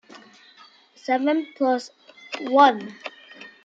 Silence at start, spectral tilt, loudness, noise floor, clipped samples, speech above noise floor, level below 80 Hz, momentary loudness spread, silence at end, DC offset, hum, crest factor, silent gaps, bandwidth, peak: 0.15 s; -4 dB/octave; -21 LUFS; -52 dBFS; under 0.1%; 31 dB; -82 dBFS; 24 LU; 0.15 s; under 0.1%; none; 22 dB; none; 7.8 kHz; -2 dBFS